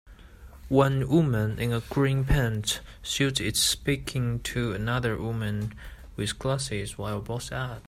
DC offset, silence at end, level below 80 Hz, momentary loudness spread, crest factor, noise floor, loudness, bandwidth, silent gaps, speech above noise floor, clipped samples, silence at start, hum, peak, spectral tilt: under 0.1%; 0 s; -42 dBFS; 10 LU; 20 dB; -48 dBFS; -27 LUFS; 16 kHz; none; 21 dB; under 0.1%; 0.05 s; none; -6 dBFS; -4.5 dB/octave